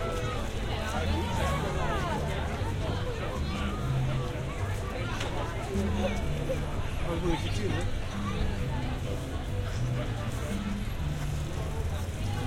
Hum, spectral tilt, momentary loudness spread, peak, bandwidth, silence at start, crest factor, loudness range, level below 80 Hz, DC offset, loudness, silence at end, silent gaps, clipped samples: none; -6 dB/octave; 4 LU; -16 dBFS; 16.5 kHz; 0 s; 14 dB; 2 LU; -36 dBFS; under 0.1%; -32 LUFS; 0 s; none; under 0.1%